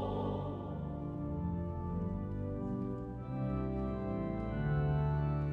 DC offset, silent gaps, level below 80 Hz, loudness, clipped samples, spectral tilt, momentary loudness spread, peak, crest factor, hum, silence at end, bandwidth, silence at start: under 0.1%; none; -46 dBFS; -37 LUFS; under 0.1%; -10.5 dB/octave; 8 LU; -22 dBFS; 14 dB; none; 0 s; 4.2 kHz; 0 s